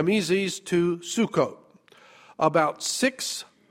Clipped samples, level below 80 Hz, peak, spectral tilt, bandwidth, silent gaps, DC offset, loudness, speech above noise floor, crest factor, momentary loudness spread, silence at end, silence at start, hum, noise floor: under 0.1%; -68 dBFS; -6 dBFS; -4 dB/octave; 16 kHz; none; under 0.1%; -25 LUFS; 30 dB; 20 dB; 8 LU; 0.25 s; 0 s; none; -55 dBFS